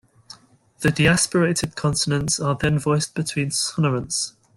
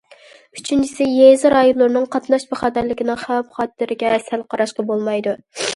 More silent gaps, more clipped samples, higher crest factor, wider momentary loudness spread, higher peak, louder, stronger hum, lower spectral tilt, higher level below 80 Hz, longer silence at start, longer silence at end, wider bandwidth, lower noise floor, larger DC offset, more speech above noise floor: neither; neither; about the same, 18 dB vs 18 dB; second, 7 LU vs 12 LU; second, -4 dBFS vs 0 dBFS; second, -21 LUFS vs -17 LUFS; neither; about the same, -4 dB/octave vs -4 dB/octave; first, -46 dBFS vs -54 dBFS; second, 0.3 s vs 0.55 s; first, 0.3 s vs 0 s; about the same, 12.5 kHz vs 11.5 kHz; first, -50 dBFS vs -46 dBFS; neither; about the same, 29 dB vs 30 dB